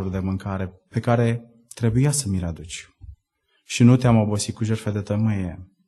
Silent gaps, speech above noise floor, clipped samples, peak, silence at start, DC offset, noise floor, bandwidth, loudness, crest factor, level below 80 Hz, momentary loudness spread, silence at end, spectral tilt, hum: none; 48 dB; under 0.1%; -4 dBFS; 0 s; under 0.1%; -69 dBFS; 12.5 kHz; -22 LUFS; 18 dB; -46 dBFS; 15 LU; 0.25 s; -6 dB/octave; none